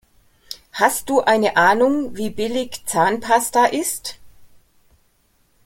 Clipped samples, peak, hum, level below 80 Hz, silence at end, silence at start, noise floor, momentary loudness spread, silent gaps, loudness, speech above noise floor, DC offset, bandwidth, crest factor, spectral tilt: under 0.1%; -2 dBFS; none; -54 dBFS; 1.2 s; 0.5 s; -61 dBFS; 14 LU; none; -18 LUFS; 43 dB; under 0.1%; 17 kHz; 18 dB; -3 dB/octave